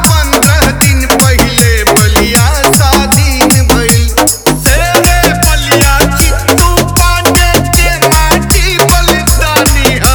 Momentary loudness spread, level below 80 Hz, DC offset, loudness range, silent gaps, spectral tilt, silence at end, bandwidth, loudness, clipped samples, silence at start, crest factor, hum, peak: 2 LU; -12 dBFS; under 0.1%; 1 LU; none; -3.5 dB/octave; 0 s; over 20 kHz; -7 LUFS; 2%; 0 s; 6 dB; none; 0 dBFS